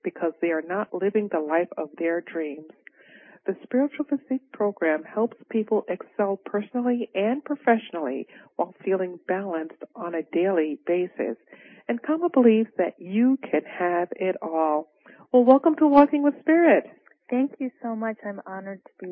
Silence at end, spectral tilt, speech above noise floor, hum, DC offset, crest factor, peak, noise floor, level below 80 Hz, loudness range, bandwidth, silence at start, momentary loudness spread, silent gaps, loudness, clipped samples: 0 s; -11 dB/octave; 28 dB; none; under 0.1%; 20 dB; -4 dBFS; -52 dBFS; -72 dBFS; 8 LU; 4.8 kHz; 0.05 s; 14 LU; none; -24 LUFS; under 0.1%